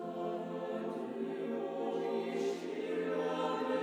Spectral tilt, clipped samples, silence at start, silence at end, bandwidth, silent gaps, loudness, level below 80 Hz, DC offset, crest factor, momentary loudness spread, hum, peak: -6 dB/octave; under 0.1%; 0 s; 0 s; 12.5 kHz; none; -37 LUFS; under -90 dBFS; under 0.1%; 14 dB; 5 LU; none; -24 dBFS